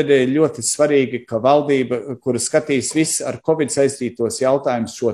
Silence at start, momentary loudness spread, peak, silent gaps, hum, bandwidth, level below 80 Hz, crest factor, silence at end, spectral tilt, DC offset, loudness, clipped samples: 0 s; 7 LU; -2 dBFS; none; none; 13.5 kHz; -60 dBFS; 16 dB; 0 s; -4.5 dB/octave; under 0.1%; -18 LUFS; under 0.1%